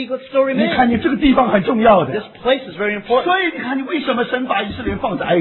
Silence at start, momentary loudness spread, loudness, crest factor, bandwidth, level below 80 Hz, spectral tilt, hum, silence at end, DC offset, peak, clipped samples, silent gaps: 0 s; 8 LU; -17 LUFS; 16 dB; 4.2 kHz; -40 dBFS; -9 dB/octave; none; 0 s; under 0.1%; 0 dBFS; under 0.1%; none